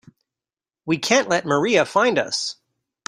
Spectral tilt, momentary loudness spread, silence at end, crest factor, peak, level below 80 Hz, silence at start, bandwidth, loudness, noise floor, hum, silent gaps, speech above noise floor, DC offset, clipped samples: -3.5 dB/octave; 8 LU; 0.55 s; 20 dB; -2 dBFS; -64 dBFS; 0.85 s; 16 kHz; -20 LUFS; under -90 dBFS; none; none; over 70 dB; under 0.1%; under 0.1%